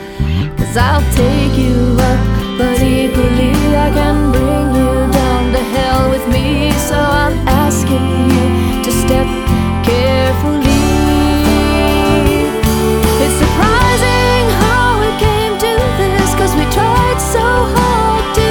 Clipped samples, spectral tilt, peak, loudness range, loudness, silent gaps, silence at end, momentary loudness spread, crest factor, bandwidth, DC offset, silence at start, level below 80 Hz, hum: under 0.1%; -5.5 dB/octave; 0 dBFS; 1 LU; -12 LUFS; none; 0 s; 3 LU; 12 dB; over 20 kHz; under 0.1%; 0 s; -18 dBFS; none